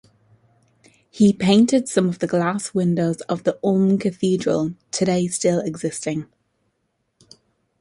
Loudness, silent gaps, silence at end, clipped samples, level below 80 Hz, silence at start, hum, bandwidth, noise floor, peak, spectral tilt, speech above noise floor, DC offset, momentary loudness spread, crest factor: -20 LUFS; none; 1.55 s; under 0.1%; -60 dBFS; 1.15 s; none; 11.5 kHz; -72 dBFS; -2 dBFS; -5.5 dB/octave; 52 dB; under 0.1%; 10 LU; 18 dB